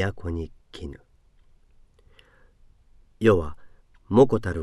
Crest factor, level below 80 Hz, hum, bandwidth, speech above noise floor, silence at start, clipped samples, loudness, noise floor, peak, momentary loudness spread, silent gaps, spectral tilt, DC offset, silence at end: 22 dB; -44 dBFS; none; 11.5 kHz; 34 dB; 0 s; under 0.1%; -23 LUFS; -57 dBFS; -4 dBFS; 21 LU; none; -8 dB/octave; under 0.1%; 0 s